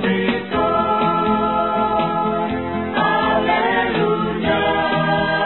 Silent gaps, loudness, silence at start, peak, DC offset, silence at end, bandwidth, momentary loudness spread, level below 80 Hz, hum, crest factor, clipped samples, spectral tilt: none; -18 LUFS; 0 s; -4 dBFS; 0.4%; 0 s; 4.3 kHz; 3 LU; -42 dBFS; none; 14 dB; under 0.1%; -11 dB/octave